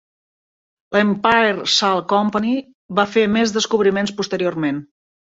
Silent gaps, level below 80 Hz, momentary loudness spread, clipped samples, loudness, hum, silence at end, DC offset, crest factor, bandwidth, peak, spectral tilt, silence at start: 2.75-2.89 s; -58 dBFS; 8 LU; under 0.1%; -18 LUFS; none; 0.5 s; under 0.1%; 18 dB; 8 kHz; -2 dBFS; -4 dB/octave; 0.9 s